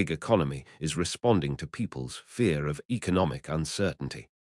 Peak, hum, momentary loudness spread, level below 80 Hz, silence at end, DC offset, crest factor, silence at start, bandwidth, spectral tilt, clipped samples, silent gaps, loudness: -10 dBFS; none; 9 LU; -52 dBFS; 0.25 s; under 0.1%; 20 dB; 0 s; 12 kHz; -5.5 dB/octave; under 0.1%; 2.85-2.89 s; -30 LUFS